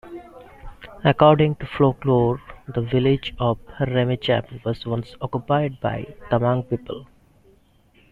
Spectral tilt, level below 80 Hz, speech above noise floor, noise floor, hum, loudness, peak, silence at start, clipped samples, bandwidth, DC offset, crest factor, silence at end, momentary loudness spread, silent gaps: -9 dB/octave; -46 dBFS; 36 dB; -57 dBFS; none; -22 LUFS; -2 dBFS; 0.05 s; under 0.1%; 4.9 kHz; under 0.1%; 20 dB; 1.1 s; 15 LU; none